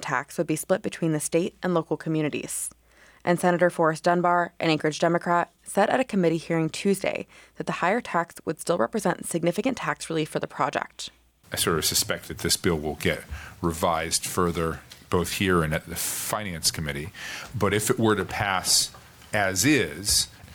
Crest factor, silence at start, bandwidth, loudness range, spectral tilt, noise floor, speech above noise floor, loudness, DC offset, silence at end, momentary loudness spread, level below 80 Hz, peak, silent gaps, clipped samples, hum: 16 dB; 0 s; over 20 kHz; 4 LU; -3.5 dB/octave; -51 dBFS; 26 dB; -25 LUFS; under 0.1%; 0 s; 10 LU; -50 dBFS; -10 dBFS; none; under 0.1%; none